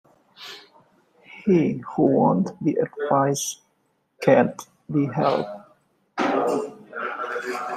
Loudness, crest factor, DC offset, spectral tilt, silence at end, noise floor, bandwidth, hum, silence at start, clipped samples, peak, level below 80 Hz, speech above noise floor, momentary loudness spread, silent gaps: -23 LUFS; 20 dB; under 0.1%; -6 dB/octave; 0 s; -69 dBFS; 14.5 kHz; none; 0.4 s; under 0.1%; -4 dBFS; -66 dBFS; 48 dB; 20 LU; none